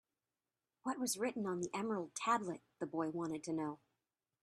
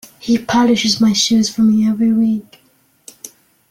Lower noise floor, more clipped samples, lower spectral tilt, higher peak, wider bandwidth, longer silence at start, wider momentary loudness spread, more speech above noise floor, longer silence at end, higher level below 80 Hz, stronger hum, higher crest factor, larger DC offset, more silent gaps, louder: first, under -90 dBFS vs -45 dBFS; neither; about the same, -4 dB/octave vs -4 dB/octave; second, -22 dBFS vs -2 dBFS; second, 13 kHz vs 15 kHz; first, 0.85 s vs 0.25 s; second, 9 LU vs 15 LU; first, over 50 dB vs 31 dB; first, 0.65 s vs 0.45 s; second, -82 dBFS vs -54 dBFS; neither; first, 20 dB vs 12 dB; neither; neither; second, -41 LUFS vs -14 LUFS